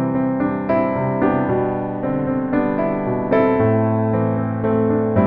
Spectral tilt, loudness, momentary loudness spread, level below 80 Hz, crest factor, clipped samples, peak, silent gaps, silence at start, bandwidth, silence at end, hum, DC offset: -12 dB/octave; -19 LUFS; 4 LU; -46 dBFS; 14 dB; under 0.1%; -4 dBFS; none; 0 s; 4.6 kHz; 0 s; none; under 0.1%